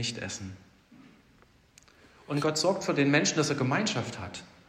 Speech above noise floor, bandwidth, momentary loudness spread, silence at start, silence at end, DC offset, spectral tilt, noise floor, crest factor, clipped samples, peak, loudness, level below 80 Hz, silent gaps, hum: 32 dB; 15 kHz; 16 LU; 0 s; 0.2 s; under 0.1%; -4 dB/octave; -61 dBFS; 20 dB; under 0.1%; -10 dBFS; -28 LUFS; -68 dBFS; none; none